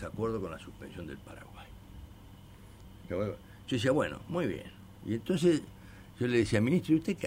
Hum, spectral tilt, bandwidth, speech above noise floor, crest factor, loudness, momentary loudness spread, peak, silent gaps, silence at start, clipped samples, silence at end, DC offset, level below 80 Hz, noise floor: none; -6.5 dB/octave; 16 kHz; 21 dB; 18 dB; -32 LUFS; 24 LU; -16 dBFS; none; 0 s; under 0.1%; 0 s; under 0.1%; -56 dBFS; -52 dBFS